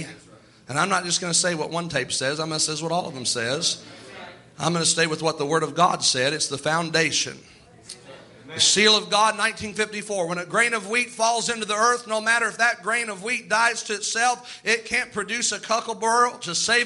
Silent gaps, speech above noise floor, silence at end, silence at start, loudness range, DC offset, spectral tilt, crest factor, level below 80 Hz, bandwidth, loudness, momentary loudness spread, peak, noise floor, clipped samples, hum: none; 27 dB; 0 s; 0 s; 3 LU; under 0.1%; -2 dB/octave; 20 dB; -64 dBFS; 11.5 kHz; -22 LUFS; 8 LU; -4 dBFS; -51 dBFS; under 0.1%; none